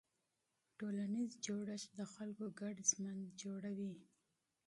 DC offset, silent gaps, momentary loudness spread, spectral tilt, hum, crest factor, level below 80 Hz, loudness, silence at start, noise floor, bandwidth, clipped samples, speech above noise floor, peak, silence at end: under 0.1%; none; 12 LU; -4 dB/octave; none; 24 dB; -88 dBFS; -44 LUFS; 0.8 s; -87 dBFS; 11.5 kHz; under 0.1%; 42 dB; -22 dBFS; 0.65 s